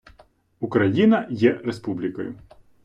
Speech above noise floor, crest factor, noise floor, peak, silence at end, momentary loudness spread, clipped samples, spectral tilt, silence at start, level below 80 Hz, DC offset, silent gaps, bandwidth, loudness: 35 dB; 18 dB; -56 dBFS; -4 dBFS; 0.45 s; 15 LU; under 0.1%; -8 dB/octave; 0.6 s; -60 dBFS; under 0.1%; none; 8.6 kHz; -22 LUFS